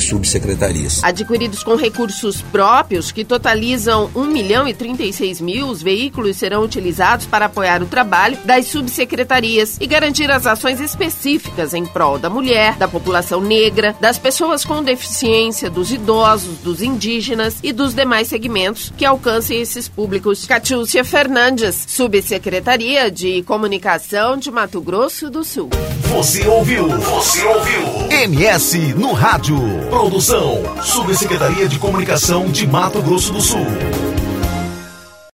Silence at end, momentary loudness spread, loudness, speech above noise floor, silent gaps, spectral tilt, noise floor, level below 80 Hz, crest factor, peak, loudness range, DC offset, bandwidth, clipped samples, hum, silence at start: 0.3 s; 7 LU; -15 LUFS; 22 dB; none; -3.5 dB/octave; -37 dBFS; -34 dBFS; 16 dB; 0 dBFS; 3 LU; under 0.1%; 16.5 kHz; under 0.1%; none; 0 s